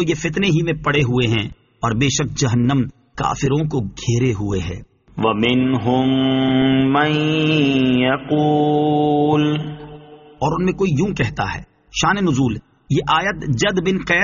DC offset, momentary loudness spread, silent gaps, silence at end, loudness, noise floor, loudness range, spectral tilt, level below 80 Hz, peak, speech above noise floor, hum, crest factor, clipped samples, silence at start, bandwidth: under 0.1%; 9 LU; none; 0 s; -18 LUFS; -40 dBFS; 4 LU; -5 dB/octave; -42 dBFS; -2 dBFS; 23 dB; none; 16 dB; under 0.1%; 0 s; 7.4 kHz